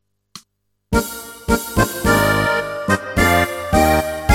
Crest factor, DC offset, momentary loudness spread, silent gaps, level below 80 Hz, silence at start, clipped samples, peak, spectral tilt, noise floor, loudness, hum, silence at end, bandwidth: 18 dB; under 0.1%; 6 LU; none; -30 dBFS; 0.35 s; under 0.1%; 0 dBFS; -4.5 dB/octave; -66 dBFS; -17 LUFS; none; 0 s; 17 kHz